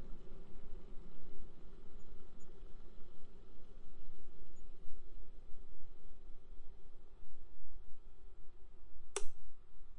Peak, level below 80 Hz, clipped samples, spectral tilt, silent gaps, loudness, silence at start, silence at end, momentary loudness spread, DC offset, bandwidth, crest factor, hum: -20 dBFS; -52 dBFS; under 0.1%; -4 dB/octave; none; -59 LUFS; 0 s; 0 s; 7 LU; under 0.1%; 10.5 kHz; 14 dB; none